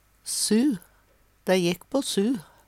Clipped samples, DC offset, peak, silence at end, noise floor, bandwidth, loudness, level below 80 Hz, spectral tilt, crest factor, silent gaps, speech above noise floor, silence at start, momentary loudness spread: under 0.1%; under 0.1%; -10 dBFS; 0.25 s; -62 dBFS; 16.5 kHz; -25 LUFS; -64 dBFS; -4 dB/octave; 16 dB; none; 37 dB; 0.25 s; 9 LU